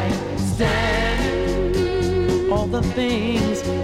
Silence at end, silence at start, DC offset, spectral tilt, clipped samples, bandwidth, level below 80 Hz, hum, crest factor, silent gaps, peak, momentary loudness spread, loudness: 0 s; 0 s; under 0.1%; -6 dB/octave; under 0.1%; 15.5 kHz; -30 dBFS; none; 14 dB; none; -6 dBFS; 3 LU; -21 LUFS